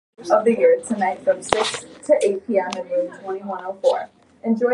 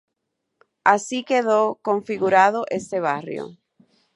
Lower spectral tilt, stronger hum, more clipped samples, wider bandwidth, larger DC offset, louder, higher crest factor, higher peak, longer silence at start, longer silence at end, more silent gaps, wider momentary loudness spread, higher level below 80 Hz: about the same, -4 dB/octave vs -4.5 dB/octave; neither; neither; about the same, 11.5 kHz vs 11.5 kHz; neither; about the same, -21 LUFS vs -21 LUFS; about the same, 20 dB vs 22 dB; about the same, 0 dBFS vs 0 dBFS; second, 0.2 s vs 0.85 s; second, 0 s vs 0.6 s; neither; about the same, 12 LU vs 12 LU; first, -60 dBFS vs -70 dBFS